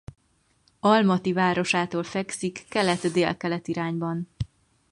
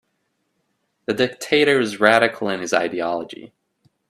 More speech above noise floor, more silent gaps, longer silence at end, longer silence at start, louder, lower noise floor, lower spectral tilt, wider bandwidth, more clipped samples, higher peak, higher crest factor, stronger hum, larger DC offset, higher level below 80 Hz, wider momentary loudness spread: second, 41 dB vs 52 dB; neither; second, 0.45 s vs 0.65 s; second, 0.85 s vs 1.1 s; second, -25 LUFS vs -19 LUFS; second, -65 dBFS vs -72 dBFS; first, -5.5 dB/octave vs -4 dB/octave; second, 11.5 kHz vs 14 kHz; neither; second, -6 dBFS vs 0 dBFS; about the same, 20 dB vs 22 dB; neither; neither; first, -54 dBFS vs -66 dBFS; second, 11 LU vs 15 LU